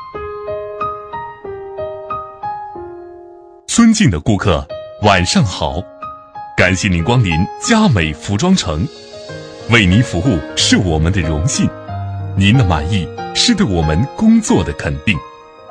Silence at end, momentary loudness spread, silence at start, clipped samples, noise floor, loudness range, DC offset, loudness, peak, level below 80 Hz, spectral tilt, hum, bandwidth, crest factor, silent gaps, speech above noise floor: 0 s; 18 LU; 0 s; under 0.1%; -38 dBFS; 4 LU; under 0.1%; -14 LUFS; 0 dBFS; -32 dBFS; -5 dB/octave; none; 10.5 kHz; 16 dB; none; 25 dB